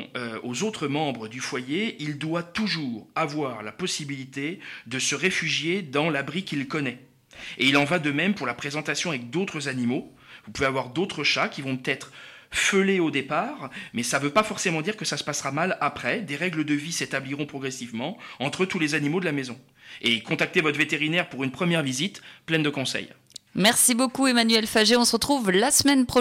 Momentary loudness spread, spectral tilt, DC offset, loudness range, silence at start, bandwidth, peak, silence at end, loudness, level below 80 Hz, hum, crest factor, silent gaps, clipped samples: 13 LU; -3.5 dB/octave; under 0.1%; 7 LU; 0 s; 16.5 kHz; -8 dBFS; 0 s; -25 LUFS; -60 dBFS; none; 18 dB; none; under 0.1%